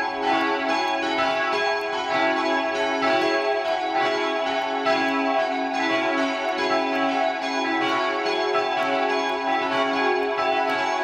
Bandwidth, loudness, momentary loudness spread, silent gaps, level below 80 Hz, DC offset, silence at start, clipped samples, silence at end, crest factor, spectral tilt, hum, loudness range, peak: 12.5 kHz; -23 LUFS; 3 LU; none; -64 dBFS; under 0.1%; 0 s; under 0.1%; 0 s; 14 dB; -3 dB/octave; none; 1 LU; -10 dBFS